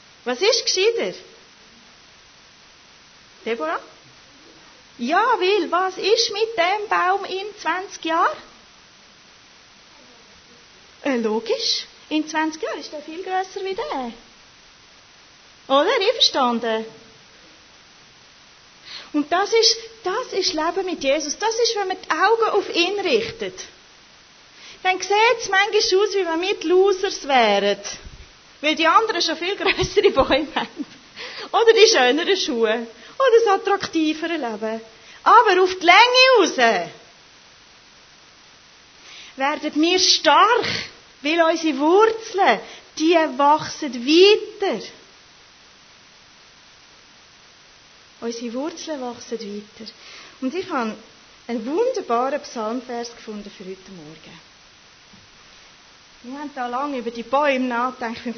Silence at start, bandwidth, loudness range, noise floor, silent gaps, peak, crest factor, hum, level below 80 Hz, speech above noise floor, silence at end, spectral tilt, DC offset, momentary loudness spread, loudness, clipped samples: 0.25 s; 6.6 kHz; 15 LU; -49 dBFS; none; 0 dBFS; 22 dB; none; -56 dBFS; 30 dB; 0 s; -2 dB/octave; under 0.1%; 19 LU; -19 LUFS; under 0.1%